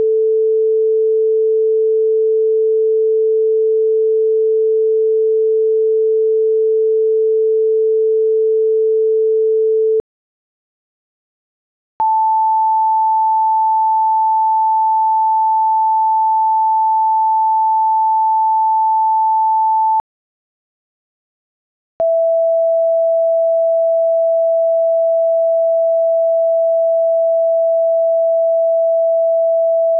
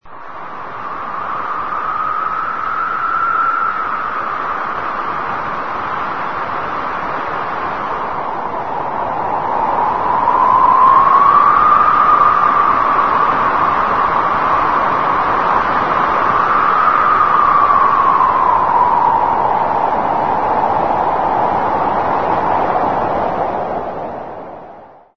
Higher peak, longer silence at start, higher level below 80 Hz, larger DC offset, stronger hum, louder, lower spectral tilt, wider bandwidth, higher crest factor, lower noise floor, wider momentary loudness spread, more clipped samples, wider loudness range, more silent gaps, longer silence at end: second, -10 dBFS vs 0 dBFS; about the same, 0 s vs 0 s; second, -70 dBFS vs -44 dBFS; second, under 0.1% vs 2%; neither; about the same, -14 LUFS vs -14 LUFS; first, -10 dB/octave vs -6.5 dB/octave; second, 1.3 kHz vs 6.4 kHz; second, 4 dB vs 14 dB; first, under -90 dBFS vs -38 dBFS; second, 0 LU vs 11 LU; neither; second, 4 LU vs 10 LU; first, 10.00-12.00 s, 20.00-22.00 s vs none; about the same, 0 s vs 0 s